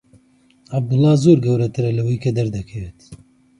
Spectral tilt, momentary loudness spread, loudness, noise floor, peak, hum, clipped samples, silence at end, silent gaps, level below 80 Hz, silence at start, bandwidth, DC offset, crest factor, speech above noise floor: -8.5 dB/octave; 17 LU; -18 LUFS; -54 dBFS; 0 dBFS; none; under 0.1%; 0.45 s; none; -46 dBFS; 0.7 s; 11 kHz; under 0.1%; 18 dB; 37 dB